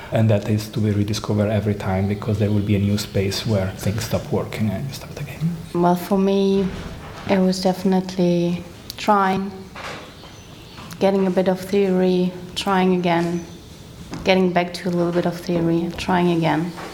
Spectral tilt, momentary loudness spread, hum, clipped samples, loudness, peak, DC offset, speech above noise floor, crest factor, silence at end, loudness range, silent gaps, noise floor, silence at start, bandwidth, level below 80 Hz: -6.5 dB/octave; 15 LU; none; under 0.1%; -21 LUFS; -2 dBFS; under 0.1%; 20 dB; 18 dB; 0 s; 2 LU; none; -40 dBFS; 0 s; 18 kHz; -46 dBFS